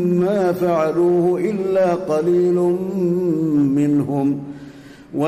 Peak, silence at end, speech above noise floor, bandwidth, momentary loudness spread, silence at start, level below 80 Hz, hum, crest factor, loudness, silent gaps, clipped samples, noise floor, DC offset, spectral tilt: -8 dBFS; 0 s; 22 dB; 14.5 kHz; 5 LU; 0 s; -56 dBFS; none; 10 dB; -18 LUFS; none; under 0.1%; -39 dBFS; under 0.1%; -8.5 dB/octave